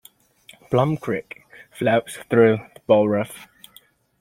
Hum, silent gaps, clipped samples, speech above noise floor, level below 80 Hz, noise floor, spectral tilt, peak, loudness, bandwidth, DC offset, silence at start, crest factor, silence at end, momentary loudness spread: none; none; under 0.1%; 34 dB; -60 dBFS; -54 dBFS; -7 dB/octave; -4 dBFS; -21 LUFS; 16 kHz; under 0.1%; 0.7 s; 20 dB; 0.75 s; 17 LU